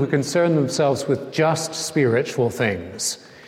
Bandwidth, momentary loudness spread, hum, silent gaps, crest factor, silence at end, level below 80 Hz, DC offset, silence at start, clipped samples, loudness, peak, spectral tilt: 16.5 kHz; 6 LU; none; none; 16 dB; 0 s; -60 dBFS; under 0.1%; 0 s; under 0.1%; -21 LUFS; -6 dBFS; -5 dB/octave